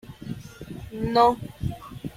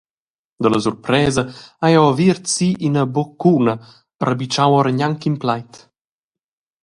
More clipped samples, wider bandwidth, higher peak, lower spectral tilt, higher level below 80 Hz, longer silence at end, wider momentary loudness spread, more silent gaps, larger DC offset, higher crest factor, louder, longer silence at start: neither; first, 16 kHz vs 11.5 kHz; second, -6 dBFS vs 0 dBFS; about the same, -6.5 dB/octave vs -5.5 dB/octave; first, -46 dBFS vs -52 dBFS; second, 0.05 s vs 1.05 s; first, 19 LU vs 8 LU; second, none vs 4.15-4.19 s; neither; about the same, 20 dB vs 18 dB; second, -24 LUFS vs -17 LUFS; second, 0.05 s vs 0.6 s